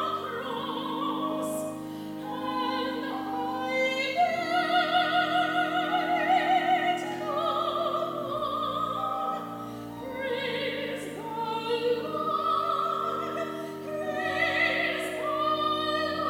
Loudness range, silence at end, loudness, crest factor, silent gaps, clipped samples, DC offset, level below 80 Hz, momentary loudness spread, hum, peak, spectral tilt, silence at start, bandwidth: 6 LU; 0 s; -28 LUFS; 18 dB; none; under 0.1%; under 0.1%; -68 dBFS; 10 LU; none; -12 dBFS; -4 dB/octave; 0 s; 18.5 kHz